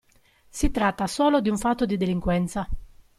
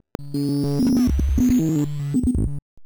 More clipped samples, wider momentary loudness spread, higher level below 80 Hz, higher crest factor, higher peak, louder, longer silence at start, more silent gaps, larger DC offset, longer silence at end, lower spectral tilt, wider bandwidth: neither; first, 13 LU vs 7 LU; second, -36 dBFS vs -28 dBFS; first, 16 dB vs 10 dB; about the same, -8 dBFS vs -10 dBFS; second, -24 LUFS vs -21 LUFS; first, 0.55 s vs 0.2 s; second, none vs 2.62-2.77 s; neither; first, 0.3 s vs 0 s; second, -5.5 dB/octave vs -7.5 dB/octave; second, 14 kHz vs over 20 kHz